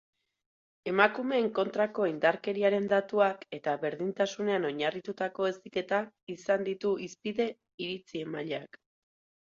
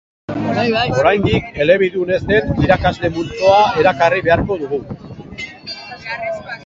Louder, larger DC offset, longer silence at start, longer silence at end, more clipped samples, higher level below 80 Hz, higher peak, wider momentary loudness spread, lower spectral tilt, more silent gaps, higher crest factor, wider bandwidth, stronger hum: second, -31 LUFS vs -15 LUFS; neither; first, 0.85 s vs 0.3 s; first, 0.8 s vs 0 s; neither; second, -76 dBFS vs -36 dBFS; second, -6 dBFS vs 0 dBFS; second, 12 LU vs 16 LU; about the same, -5.5 dB/octave vs -6.5 dB/octave; first, 6.23-6.27 s, 7.74-7.78 s vs none; first, 24 dB vs 16 dB; about the same, 7.6 kHz vs 7.6 kHz; neither